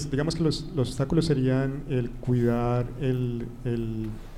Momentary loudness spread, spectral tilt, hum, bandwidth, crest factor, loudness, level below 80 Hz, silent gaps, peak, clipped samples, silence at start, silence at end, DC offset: 7 LU; -7 dB/octave; none; 12 kHz; 16 dB; -27 LUFS; -40 dBFS; none; -10 dBFS; under 0.1%; 0 s; 0 s; under 0.1%